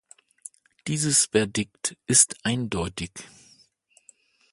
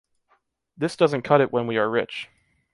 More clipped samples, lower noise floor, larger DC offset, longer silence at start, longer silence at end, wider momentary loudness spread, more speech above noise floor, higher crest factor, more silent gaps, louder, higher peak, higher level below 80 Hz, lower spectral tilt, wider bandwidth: neither; second, -62 dBFS vs -68 dBFS; neither; about the same, 0.85 s vs 0.8 s; first, 1.3 s vs 0.5 s; first, 26 LU vs 14 LU; second, 37 dB vs 46 dB; about the same, 26 dB vs 22 dB; neither; about the same, -23 LUFS vs -23 LUFS; about the same, -2 dBFS vs -2 dBFS; first, -52 dBFS vs -66 dBFS; second, -3 dB/octave vs -6.5 dB/octave; about the same, 12 kHz vs 11.5 kHz